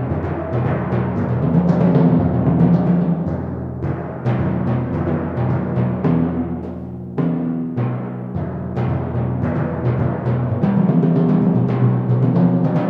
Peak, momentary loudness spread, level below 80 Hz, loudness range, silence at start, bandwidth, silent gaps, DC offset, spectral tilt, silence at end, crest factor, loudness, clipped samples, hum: -4 dBFS; 10 LU; -40 dBFS; 5 LU; 0 s; 4.5 kHz; none; under 0.1%; -11.5 dB/octave; 0 s; 14 dB; -19 LUFS; under 0.1%; none